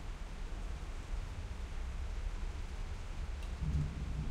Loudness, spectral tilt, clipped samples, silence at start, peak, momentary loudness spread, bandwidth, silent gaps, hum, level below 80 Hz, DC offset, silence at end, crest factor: -44 LUFS; -6 dB/octave; under 0.1%; 0 s; -24 dBFS; 8 LU; 11 kHz; none; none; -40 dBFS; under 0.1%; 0 s; 14 dB